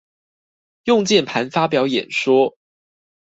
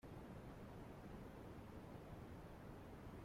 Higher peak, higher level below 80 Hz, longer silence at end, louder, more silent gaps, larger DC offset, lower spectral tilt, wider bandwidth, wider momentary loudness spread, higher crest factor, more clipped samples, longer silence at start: first, -2 dBFS vs -44 dBFS; about the same, -62 dBFS vs -64 dBFS; first, 0.75 s vs 0 s; first, -18 LUFS vs -57 LUFS; neither; neither; second, -4.5 dB/octave vs -7 dB/octave; second, 8 kHz vs 16.5 kHz; first, 6 LU vs 1 LU; first, 18 dB vs 12 dB; neither; first, 0.85 s vs 0.05 s